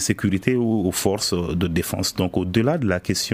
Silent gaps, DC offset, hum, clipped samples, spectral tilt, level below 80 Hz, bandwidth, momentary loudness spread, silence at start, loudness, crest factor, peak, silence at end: none; under 0.1%; none; under 0.1%; -4.5 dB/octave; -44 dBFS; 16 kHz; 2 LU; 0 s; -22 LUFS; 18 dB; -4 dBFS; 0 s